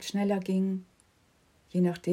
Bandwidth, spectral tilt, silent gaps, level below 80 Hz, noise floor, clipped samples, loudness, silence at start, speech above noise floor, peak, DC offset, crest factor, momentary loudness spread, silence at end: 15.5 kHz; -7 dB/octave; none; -72 dBFS; -66 dBFS; under 0.1%; -30 LUFS; 0 s; 38 dB; -16 dBFS; under 0.1%; 14 dB; 6 LU; 0 s